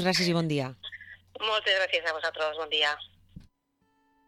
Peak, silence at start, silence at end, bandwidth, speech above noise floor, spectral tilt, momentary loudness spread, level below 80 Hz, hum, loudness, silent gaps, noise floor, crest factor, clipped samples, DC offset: -12 dBFS; 0 s; 0.85 s; 15.5 kHz; 45 dB; -4 dB/octave; 17 LU; -64 dBFS; none; -27 LUFS; none; -73 dBFS; 18 dB; under 0.1%; under 0.1%